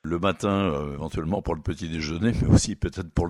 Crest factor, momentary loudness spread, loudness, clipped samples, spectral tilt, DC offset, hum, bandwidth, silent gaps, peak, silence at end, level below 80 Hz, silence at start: 20 dB; 10 LU; -25 LUFS; under 0.1%; -6 dB/octave; under 0.1%; none; 12 kHz; none; -4 dBFS; 0 s; -36 dBFS; 0.05 s